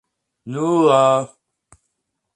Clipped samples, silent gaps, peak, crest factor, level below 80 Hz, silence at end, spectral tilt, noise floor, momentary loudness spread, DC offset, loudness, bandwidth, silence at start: under 0.1%; none; -2 dBFS; 18 dB; -66 dBFS; 1.1 s; -6 dB/octave; -75 dBFS; 17 LU; under 0.1%; -16 LUFS; 10.5 kHz; 0.45 s